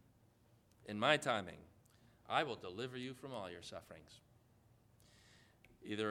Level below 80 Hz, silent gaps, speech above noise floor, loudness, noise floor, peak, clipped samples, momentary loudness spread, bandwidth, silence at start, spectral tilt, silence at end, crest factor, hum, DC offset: -76 dBFS; none; 30 dB; -40 LUFS; -71 dBFS; -16 dBFS; under 0.1%; 24 LU; 16.5 kHz; 0.85 s; -4 dB/octave; 0 s; 28 dB; none; under 0.1%